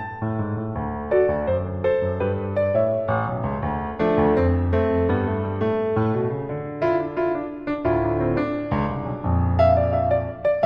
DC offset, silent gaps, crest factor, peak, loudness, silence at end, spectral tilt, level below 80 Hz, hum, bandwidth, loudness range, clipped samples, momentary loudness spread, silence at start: under 0.1%; none; 16 dB; -6 dBFS; -23 LUFS; 0 s; -10.5 dB/octave; -38 dBFS; none; 5.4 kHz; 2 LU; under 0.1%; 8 LU; 0 s